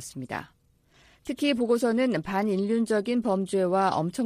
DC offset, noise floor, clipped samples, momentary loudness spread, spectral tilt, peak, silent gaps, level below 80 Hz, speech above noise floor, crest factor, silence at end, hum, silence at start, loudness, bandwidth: under 0.1%; -61 dBFS; under 0.1%; 12 LU; -5.5 dB/octave; -12 dBFS; none; -62 dBFS; 35 dB; 16 dB; 0 s; none; 0 s; -26 LUFS; 15 kHz